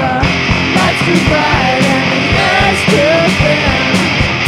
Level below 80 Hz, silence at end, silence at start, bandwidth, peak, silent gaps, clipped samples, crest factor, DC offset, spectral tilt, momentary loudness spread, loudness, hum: -26 dBFS; 0 s; 0 s; 15 kHz; 0 dBFS; none; under 0.1%; 10 dB; under 0.1%; -5 dB/octave; 2 LU; -10 LUFS; none